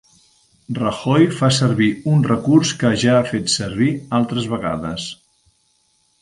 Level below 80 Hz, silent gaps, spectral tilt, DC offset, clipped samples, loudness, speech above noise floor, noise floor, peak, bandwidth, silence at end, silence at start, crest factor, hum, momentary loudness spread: -50 dBFS; none; -5.5 dB/octave; under 0.1%; under 0.1%; -18 LUFS; 45 dB; -62 dBFS; -2 dBFS; 11.5 kHz; 1.1 s; 0.7 s; 16 dB; none; 9 LU